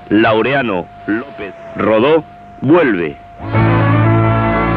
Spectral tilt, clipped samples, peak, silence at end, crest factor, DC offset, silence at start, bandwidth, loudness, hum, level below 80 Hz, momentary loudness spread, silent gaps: -10 dB/octave; under 0.1%; 0 dBFS; 0 s; 12 dB; under 0.1%; 0 s; 4.7 kHz; -14 LUFS; none; -34 dBFS; 11 LU; none